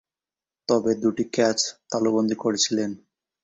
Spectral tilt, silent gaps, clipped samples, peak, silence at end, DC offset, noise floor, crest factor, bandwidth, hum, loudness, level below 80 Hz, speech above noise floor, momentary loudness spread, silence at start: -3.5 dB/octave; none; under 0.1%; -8 dBFS; 0.45 s; under 0.1%; under -90 dBFS; 18 dB; 8.2 kHz; none; -23 LUFS; -64 dBFS; over 67 dB; 8 LU; 0.7 s